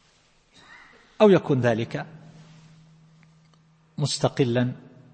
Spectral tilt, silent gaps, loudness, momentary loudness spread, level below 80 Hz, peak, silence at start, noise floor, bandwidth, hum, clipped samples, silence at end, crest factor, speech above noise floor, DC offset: -6 dB/octave; none; -23 LUFS; 21 LU; -64 dBFS; -6 dBFS; 1.2 s; -61 dBFS; 8.8 kHz; none; under 0.1%; 0.35 s; 20 dB; 39 dB; under 0.1%